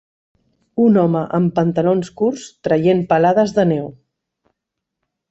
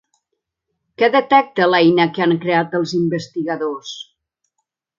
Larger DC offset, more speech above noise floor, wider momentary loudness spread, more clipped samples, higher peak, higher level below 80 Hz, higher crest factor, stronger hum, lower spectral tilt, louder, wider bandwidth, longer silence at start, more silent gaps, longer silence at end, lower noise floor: neither; first, 64 dB vs 60 dB; second, 9 LU vs 12 LU; neither; about the same, -2 dBFS vs 0 dBFS; first, -56 dBFS vs -66 dBFS; about the same, 16 dB vs 18 dB; neither; first, -8 dB/octave vs -6 dB/octave; about the same, -16 LUFS vs -16 LUFS; about the same, 8 kHz vs 7.4 kHz; second, 0.75 s vs 1 s; neither; first, 1.4 s vs 0.95 s; about the same, -80 dBFS vs -77 dBFS